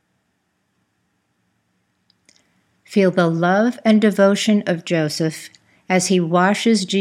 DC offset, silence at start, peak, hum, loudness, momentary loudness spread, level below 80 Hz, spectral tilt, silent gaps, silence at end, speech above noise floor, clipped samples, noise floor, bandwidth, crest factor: under 0.1%; 2.9 s; -2 dBFS; none; -17 LUFS; 7 LU; -72 dBFS; -5 dB/octave; none; 0 s; 52 dB; under 0.1%; -69 dBFS; 14.5 kHz; 18 dB